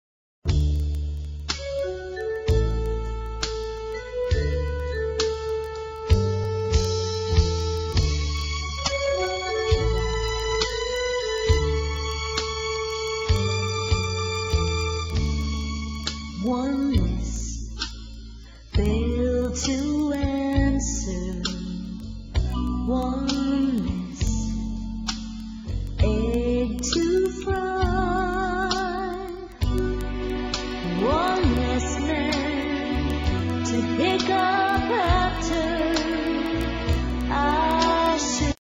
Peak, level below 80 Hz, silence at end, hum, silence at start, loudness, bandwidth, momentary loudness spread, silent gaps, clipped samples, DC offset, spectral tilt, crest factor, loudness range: -6 dBFS; -30 dBFS; 0.2 s; none; 0.45 s; -25 LUFS; 14 kHz; 9 LU; none; under 0.1%; under 0.1%; -5 dB/octave; 18 dB; 4 LU